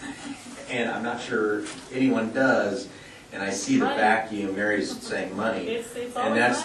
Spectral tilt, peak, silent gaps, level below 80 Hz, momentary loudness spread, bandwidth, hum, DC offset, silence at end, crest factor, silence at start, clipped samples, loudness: -4 dB/octave; -8 dBFS; none; -62 dBFS; 14 LU; 12.5 kHz; none; under 0.1%; 0 s; 18 dB; 0 s; under 0.1%; -26 LUFS